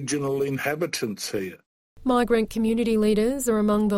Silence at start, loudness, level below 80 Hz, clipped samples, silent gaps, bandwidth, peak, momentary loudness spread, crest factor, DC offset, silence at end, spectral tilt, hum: 0 s; -24 LUFS; -48 dBFS; under 0.1%; 1.66-1.96 s; 16.5 kHz; -10 dBFS; 8 LU; 14 dB; under 0.1%; 0 s; -5 dB/octave; none